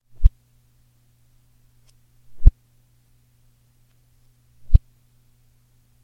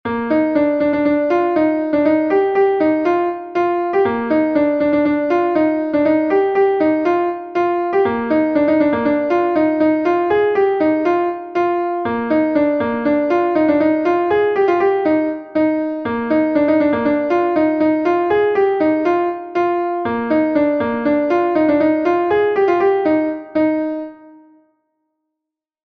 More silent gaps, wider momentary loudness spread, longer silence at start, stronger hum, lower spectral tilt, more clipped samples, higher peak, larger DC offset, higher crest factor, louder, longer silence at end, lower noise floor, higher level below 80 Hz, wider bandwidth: neither; about the same, 3 LU vs 4 LU; first, 0.2 s vs 0.05 s; neither; first, -9.5 dB/octave vs -8 dB/octave; neither; first, 0 dBFS vs -4 dBFS; neither; first, 22 dB vs 12 dB; second, -22 LUFS vs -16 LUFS; second, 1.25 s vs 1.55 s; second, -59 dBFS vs -83 dBFS; first, -24 dBFS vs -54 dBFS; second, 0.9 kHz vs 6.2 kHz